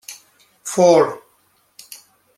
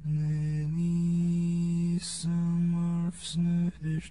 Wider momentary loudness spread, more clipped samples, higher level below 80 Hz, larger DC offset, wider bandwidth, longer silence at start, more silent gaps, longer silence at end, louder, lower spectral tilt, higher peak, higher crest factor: first, 26 LU vs 4 LU; neither; second, -70 dBFS vs -54 dBFS; second, under 0.1% vs 0.2%; first, 15.5 kHz vs 11 kHz; about the same, 0.1 s vs 0 s; neither; first, 0.4 s vs 0 s; first, -16 LUFS vs -29 LUFS; second, -4.5 dB/octave vs -6.5 dB/octave; first, -2 dBFS vs -22 dBFS; first, 18 dB vs 6 dB